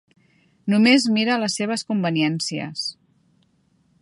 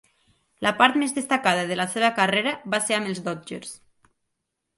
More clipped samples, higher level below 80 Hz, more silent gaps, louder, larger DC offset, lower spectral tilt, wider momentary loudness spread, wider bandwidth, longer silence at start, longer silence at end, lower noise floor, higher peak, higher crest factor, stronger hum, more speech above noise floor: neither; about the same, -70 dBFS vs -68 dBFS; neither; about the same, -21 LUFS vs -23 LUFS; neither; first, -4.5 dB/octave vs -3 dB/octave; about the same, 13 LU vs 14 LU; about the same, 11.5 kHz vs 12 kHz; about the same, 0.65 s vs 0.6 s; about the same, 1.1 s vs 1 s; second, -63 dBFS vs -80 dBFS; second, -4 dBFS vs 0 dBFS; about the same, 20 dB vs 24 dB; neither; second, 43 dB vs 56 dB